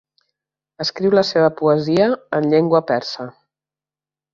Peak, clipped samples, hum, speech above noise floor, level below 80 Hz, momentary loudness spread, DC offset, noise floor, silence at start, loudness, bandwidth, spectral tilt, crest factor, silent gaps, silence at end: -2 dBFS; under 0.1%; 50 Hz at -45 dBFS; over 73 dB; -62 dBFS; 11 LU; under 0.1%; under -90 dBFS; 0.8 s; -17 LUFS; 7.4 kHz; -6.5 dB/octave; 16 dB; none; 1.05 s